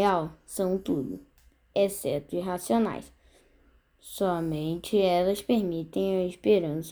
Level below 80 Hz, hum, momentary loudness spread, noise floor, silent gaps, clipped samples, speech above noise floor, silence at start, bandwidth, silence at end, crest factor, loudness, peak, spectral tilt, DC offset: -58 dBFS; none; 8 LU; -62 dBFS; none; under 0.1%; 35 dB; 0 s; over 20 kHz; 0 s; 16 dB; -28 LUFS; -12 dBFS; -6 dB/octave; under 0.1%